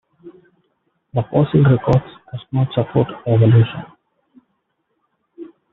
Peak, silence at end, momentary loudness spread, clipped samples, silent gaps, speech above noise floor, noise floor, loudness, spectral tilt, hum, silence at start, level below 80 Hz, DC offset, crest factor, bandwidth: -2 dBFS; 0.25 s; 21 LU; under 0.1%; none; 55 dB; -70 dBFS; -17 LUFS; -8.5 dB/octave; none; 0.25 s; -48 dBFS; under 0.1%; 18 dB; 4.1 kHz